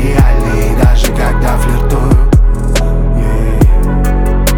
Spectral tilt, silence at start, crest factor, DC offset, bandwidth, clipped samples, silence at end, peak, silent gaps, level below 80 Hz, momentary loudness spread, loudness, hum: -6.5 dB/octave; 0 s; 8 dB; under 0.1%; 17 kHz; under 0.1%; 0 s; 0 dBFS; none; -10 dBFS; 4 LU; -12 LUFS; none